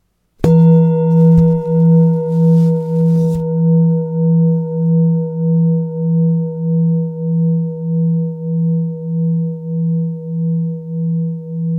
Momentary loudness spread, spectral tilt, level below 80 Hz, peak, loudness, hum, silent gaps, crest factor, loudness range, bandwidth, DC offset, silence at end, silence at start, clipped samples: 9 LU; -12 dB/octave; -42 dBFS; 0 dBFS; -14 LUFS; none; none; 14 dB; 6 LU; 1.5 kHz; under 0.1%; 0 s; 0.4 s; under 0.1%